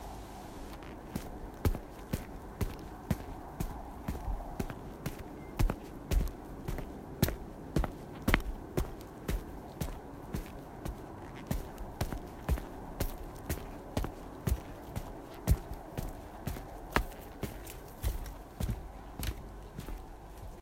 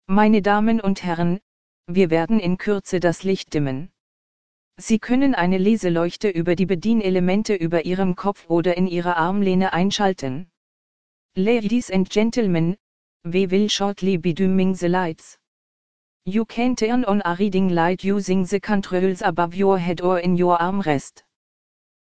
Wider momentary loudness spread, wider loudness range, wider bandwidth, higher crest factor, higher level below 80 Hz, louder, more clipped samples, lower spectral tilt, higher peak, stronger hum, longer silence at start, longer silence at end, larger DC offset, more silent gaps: first, 12 LU vs 6 LU; about the same, 5 LU vs 3 LU; first, 16 kHz vs 9.2 kHz; first, 32 dB vs 18 dB; first, -40 dBFS vs -48 dBFS; second, -40 LUFS vs -21 LUFS; neither; about the same, -5.5 dB/octave vs -6.5 dB/octave; second, -6 dBFS vs -2 dBFS; neither; about the same, 0 s vs 0 s; second, 0 s vs 0.65 s; second, under 0.1% vs 2%; second, none vs 1.42-1.84 s, 4.00-4.71 s, 10.57-11.29 s, 12.80-13.20 s, 15.47-16.20 s